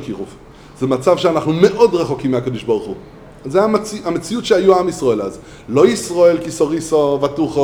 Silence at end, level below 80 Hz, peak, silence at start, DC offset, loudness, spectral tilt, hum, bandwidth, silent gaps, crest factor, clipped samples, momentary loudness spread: 0 s; -46 dBFS; 0 dBFS; 0 s; under 0.1%; -16 LUFS; -5.5 dB/octave; none; 15 kHz; none; 16 dB; under 0.1%; 14 LU